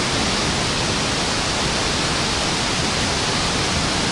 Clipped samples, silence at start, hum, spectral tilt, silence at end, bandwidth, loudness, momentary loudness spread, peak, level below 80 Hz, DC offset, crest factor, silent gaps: under 0.1%; 0 s; none; -3 dB/octave; 0 s; 11.5 kHz; -19 LUFS; 1 LU; -8 dBFS; -34 dBFS; under 0.1%; 12 dB; none